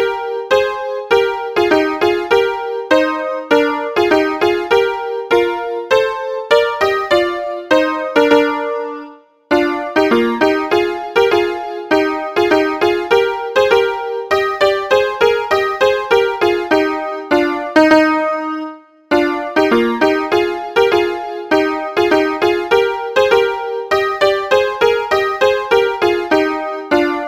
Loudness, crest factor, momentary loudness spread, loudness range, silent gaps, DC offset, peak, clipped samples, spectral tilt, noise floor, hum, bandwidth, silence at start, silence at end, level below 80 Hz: -15 LUFS; 14 dB; 6 LU; 1 LU; none; under 0.1%; 0 dBFS; under 0.1%; -4 dB/octave; -37 dBFS; none; 16 kHz; 0 s; 0 s; -50 dBFS